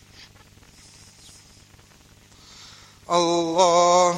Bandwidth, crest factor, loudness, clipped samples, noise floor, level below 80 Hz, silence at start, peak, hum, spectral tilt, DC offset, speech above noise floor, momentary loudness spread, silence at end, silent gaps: 11.5 kHz; 20 dB; -19 LUFS; under 0.1%; -52 dBFS; -60 dBFS; 3.1 s; -4 dBFS; 50 Hz at -60 dBFS; -3.5 dB/octave; under 0.1%; 34 dB; 28 LU; 0 s; none